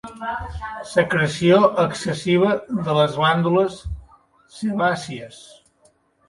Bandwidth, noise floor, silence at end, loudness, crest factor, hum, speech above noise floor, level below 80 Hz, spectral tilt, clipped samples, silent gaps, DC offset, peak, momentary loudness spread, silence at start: 11.5 kHz; -60 dBFS; 0.9 s; -20 LUFS; 18 dB; none; 40 dB; -44 dBFS; -6 dB/octave; under 0.1%; none; under 0.1%; -2 dBFS; 17 LU; 0.05 s